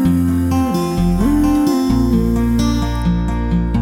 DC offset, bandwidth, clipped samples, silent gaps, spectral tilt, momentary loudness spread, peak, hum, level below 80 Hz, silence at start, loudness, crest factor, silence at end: under 0.1%; 17 kHz; under 0.1%; none; -7 dB/octave; 4 LU; -4 dBFS; none; -22 dBFS; 0 s; -16 LUFS; 10 dB; 0 s